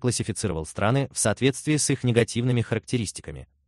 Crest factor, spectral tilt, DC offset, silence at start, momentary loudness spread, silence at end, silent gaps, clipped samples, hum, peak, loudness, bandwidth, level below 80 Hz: 22 dB; -5 dB/octave; under 0.1%; 0 s; 7 LU; 0.25 s; none; under 0.1%; none; -4 dBFS; -25 LUFS; 12.5 kHz; -50 dBFS